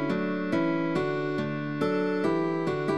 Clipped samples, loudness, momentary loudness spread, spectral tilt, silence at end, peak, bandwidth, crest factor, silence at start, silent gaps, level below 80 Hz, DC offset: under 0.1%; -28 LUFS; 3 LU; -7.5 dB/octave; 0 s; -14 dBFS; 11 kHz; 14 dB; 0 s; none; -66 dBFS; 0.3%